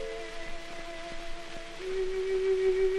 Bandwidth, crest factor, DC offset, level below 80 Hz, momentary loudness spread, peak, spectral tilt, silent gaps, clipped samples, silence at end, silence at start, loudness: 11 kHz; 14 dB; under 0.1%; -44 dBFS; 15 LU; -18 dBFS; -4.5 dB/octave; none; under 0.1%; 0 s; 0 s; -33 LUFS